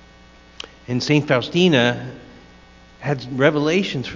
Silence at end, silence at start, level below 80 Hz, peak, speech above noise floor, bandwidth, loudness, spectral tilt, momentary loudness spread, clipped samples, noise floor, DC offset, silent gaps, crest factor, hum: 0 s; 0.65 s; -52 dBFS; 0 dBFS; 28 dB; 7.6 kHz; -19 LUFS; -5.5 dB/octave; 20 LU; under 0.1%; -47 dBFS; under 0.1%; none; 20 dB; none